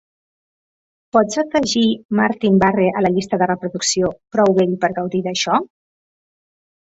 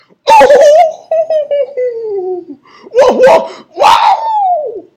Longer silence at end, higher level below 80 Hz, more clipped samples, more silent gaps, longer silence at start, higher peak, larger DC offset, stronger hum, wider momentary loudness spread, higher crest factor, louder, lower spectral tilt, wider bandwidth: first, 1.15 s vs 0.15 s; about the same, -52 dBFS vs -48 dBFS; second, under 0.1% vs 3%; first, 2.05-2.09 s vs none; first, 1.15 s vs 0.25 s; about the same, -2 dBFS vs 0 dBFS; neither; neither; second, 5 LU vs 13 LU; first, 18 dB vs 8 dB; second, -17 LUFS vs -9 LUFS; first, -4.5 dB/octave vs -3 dB/octave; second, 8 kHz vs 15.5 kHz